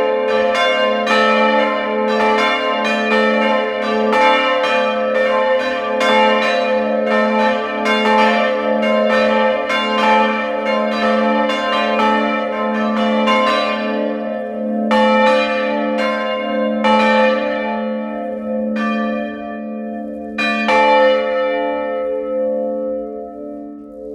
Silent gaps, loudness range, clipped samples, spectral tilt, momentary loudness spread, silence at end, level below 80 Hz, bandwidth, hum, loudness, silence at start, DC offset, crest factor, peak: none; 3 LU; under 0.1%; -5 dB/octave; 10 LU; 0 s; -56 dBFS; 10.5 kHz; none; -16 LUFS; 0 s; under 0.1%; 14 dB; -2 dBFS